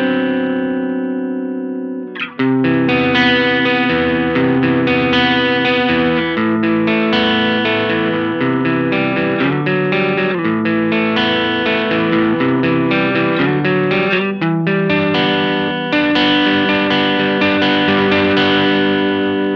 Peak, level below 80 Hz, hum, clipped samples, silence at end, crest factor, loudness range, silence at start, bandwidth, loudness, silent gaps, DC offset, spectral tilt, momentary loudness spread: 0 dBFS; -48 dBFS; none; under 0.1%; 0 s; 14 dB; 2 LU; 0 s; 6.6 kHz; -14 LUFS; none; under 0.1%; -7 dB/octave; 5 LU